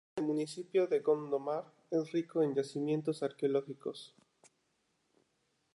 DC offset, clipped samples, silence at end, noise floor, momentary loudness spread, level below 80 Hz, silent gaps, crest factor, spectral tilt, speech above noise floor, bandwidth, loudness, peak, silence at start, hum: under 0.1%; under 0.1%; 1.7 s; -79 dBFS; 11 LU; -88 dBFS; none; 18 dB; -6.5 dB/octave; 44 dB; 11.5 kHz; -35 LUFS; -18 dBFS; 0.15 s; none